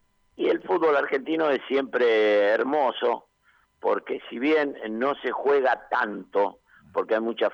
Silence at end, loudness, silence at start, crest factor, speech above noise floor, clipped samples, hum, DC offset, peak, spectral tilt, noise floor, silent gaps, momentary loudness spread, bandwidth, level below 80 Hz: 0 s; -25 LUFS; 0.4 s; 14 dB; 40 dB; under 0.1%; none; under 0.1%; -12 dBFS; -5.5 dB/octave; -64 dBFS; none; 8 LU; 6.8 kHz; -72 dBFS